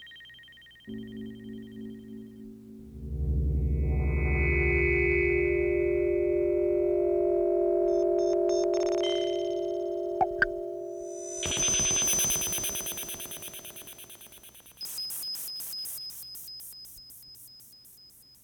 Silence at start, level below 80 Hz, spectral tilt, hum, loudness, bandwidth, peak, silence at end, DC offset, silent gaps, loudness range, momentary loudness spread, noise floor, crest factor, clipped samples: 0 s; -38 dBFS; -3.5 dB/octave; none; -28 LUFS; over 20 kHz; -12 dBFS; 0.35 s; under 0.1%; none; 10 LU; 22 LU; -55 dBFS; 18 dB; under 0.1%